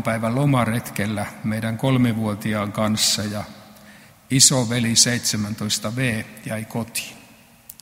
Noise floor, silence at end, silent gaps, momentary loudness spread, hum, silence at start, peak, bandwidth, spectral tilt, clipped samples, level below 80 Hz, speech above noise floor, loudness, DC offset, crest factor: -49 dBFS; 0.1 s; none; 14 LU; none; 0 s; 0 dBFS; 16.5 kHz; -3.5 dB/octave; under 0.1%; -54 dBFS; 28 dB; -20 LUFS; under 0.1%; 22 dB